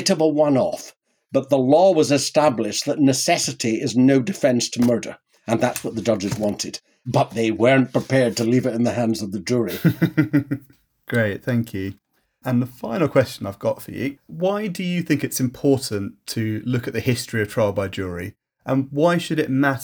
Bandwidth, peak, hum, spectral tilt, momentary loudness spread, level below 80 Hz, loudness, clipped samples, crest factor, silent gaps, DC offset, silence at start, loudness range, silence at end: over 20 kHz; -4 dBFS; none; -5.5 dB/octave; 12 LU; -58 dBFS; -21 LUFS; under 0.1%; 16 dB; none; under 0.1%; 0 s; 5 LU; 0 s